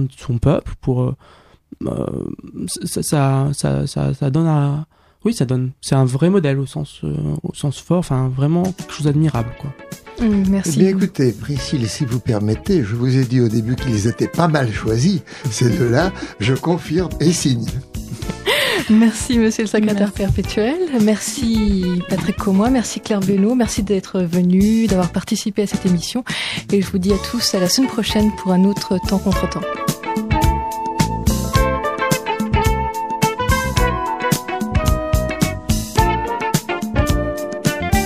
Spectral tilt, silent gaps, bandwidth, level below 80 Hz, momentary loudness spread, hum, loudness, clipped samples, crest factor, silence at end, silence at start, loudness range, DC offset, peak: -5.5 dB/octave; none; 15.5 kHz; -30 dBFS; 8 LU; none; -18 LUFS; under 0.1%; 18 dB; 0 s; 0 s; 2 LU; under 0.1%; 0 dBFS